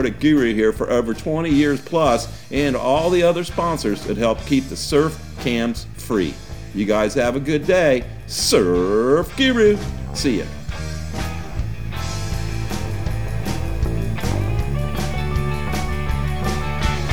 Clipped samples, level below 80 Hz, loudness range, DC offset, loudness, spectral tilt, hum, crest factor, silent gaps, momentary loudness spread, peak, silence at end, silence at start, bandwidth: under 0.1%; -30 dBFS; 8 LU; 1%; -20 LUFS; -5.5 dB/octave; none; 18 dB; none; 11 LU; -2 dBFS; 0 s; 0 s; over 20 kHz